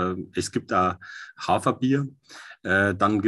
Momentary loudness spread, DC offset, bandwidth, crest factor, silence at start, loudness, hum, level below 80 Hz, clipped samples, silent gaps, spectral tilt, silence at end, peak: 16 LU; under 0.1%; 12.5 kHz; 18 dB; 0 s; -24 LUFS; none; -50 dBFS; under 0.1%; none; -5.5 dB/octave; 0 s; -8 dBFS